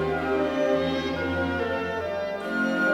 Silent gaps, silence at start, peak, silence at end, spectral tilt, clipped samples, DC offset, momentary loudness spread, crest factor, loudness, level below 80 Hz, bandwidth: none; 0 s; -12 dBFS; 0 s; -6 dB/octave; under 0.1%; under 0.1%; 5 LU; 14 dB; -26 LUFS; -54 dBFS; 16.5 kHz